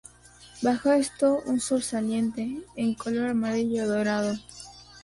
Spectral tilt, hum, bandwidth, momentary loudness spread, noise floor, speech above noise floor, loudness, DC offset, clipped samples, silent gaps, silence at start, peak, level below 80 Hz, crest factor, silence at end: -4.5 dB/octave; 60 Hz at -50 dBFS; 11.5 kHz; 11 LU; -52 dBFS; 26 dB; -27 LUFS; under 0.1%; under 0.1%; none; 0.4 s; -12 dBFS; -58 dBFS; 16 dB; 0.05 s